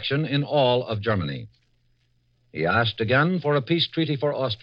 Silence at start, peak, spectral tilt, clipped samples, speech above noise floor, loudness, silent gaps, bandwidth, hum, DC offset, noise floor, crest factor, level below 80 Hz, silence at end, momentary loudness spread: 0 s; -8 dBFS; -8.5 dB/octave; under 0.1%; 43 dB; -23 LUFS; none; 5.8 kHz; 60 Hz at -55 dBFS; under 0.1%; -66 dBFS; 16 dB; -58 dBFS; 0.05 s; 7 LU